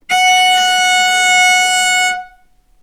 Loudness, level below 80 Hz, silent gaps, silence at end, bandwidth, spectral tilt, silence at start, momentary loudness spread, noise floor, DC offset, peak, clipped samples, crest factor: -10 LUFS; -54 dBFS; none; 0.55 s; 18.5 kHz; 2.5 dB/octave; 0.1 s; 5 LU; -49 dBFS; under 0.1%; 0 dBFS; under 0.1%; 12 dB